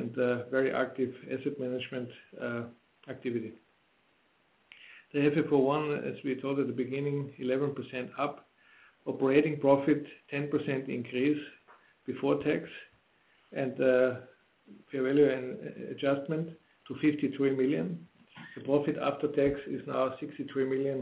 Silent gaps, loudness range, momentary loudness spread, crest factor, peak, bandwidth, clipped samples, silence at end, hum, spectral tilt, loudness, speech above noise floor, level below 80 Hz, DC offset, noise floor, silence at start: none; 5 LU; 16 LU; 20 dB; -12 dBFS; 4 kHz; under 0.1%; 0 s; none; -6 dB/octave; -31 LUFS; 39 dB; -70 dBFS; under 0.1%; -70 dBFS; 0 s